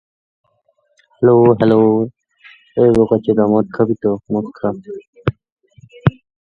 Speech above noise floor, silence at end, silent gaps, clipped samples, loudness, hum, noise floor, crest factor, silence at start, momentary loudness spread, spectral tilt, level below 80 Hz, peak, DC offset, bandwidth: 48 dB; 0.4 s; 5.07-5.13 s, 5.52-5.57 s; under 0.1%; -15 LUFS; none; -62 dBFS; 16 dB; 1.2 s; 13 LU; -10 dB/octave; -46 dBFS; 0 dBFS; under 0.1%; 5.4 kHz